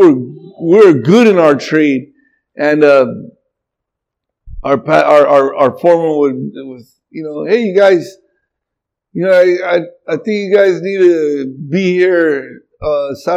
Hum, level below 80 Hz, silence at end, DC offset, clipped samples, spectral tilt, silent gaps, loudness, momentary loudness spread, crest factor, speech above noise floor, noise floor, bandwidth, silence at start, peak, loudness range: none; -44 dBFS; 0 s; under 0.1%; 0.4%; -7 dB/octave; none; -11 LUFS; 16 LU; 12 dB; 68 dB; -79 dBFS; 9.2 kHz; 0 s; 0 dBFS; 4 LU